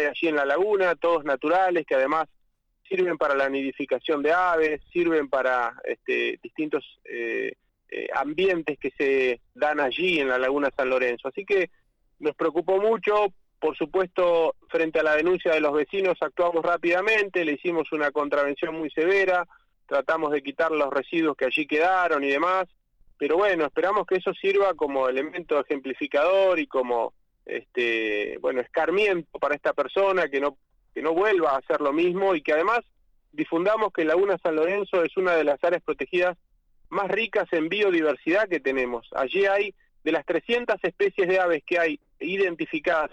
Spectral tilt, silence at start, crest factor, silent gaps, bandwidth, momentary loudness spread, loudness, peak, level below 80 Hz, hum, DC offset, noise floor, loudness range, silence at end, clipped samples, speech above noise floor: -5.5 dB/octave; 0 s; 12 dB; none; 8.8 kHz; 8 LU; -24 LUFS; -14 dBFS; -62 dBFS; none; under 0.1%; -66 dBFS; 2 LU; 0.05 s; under 0.1%; 41 dB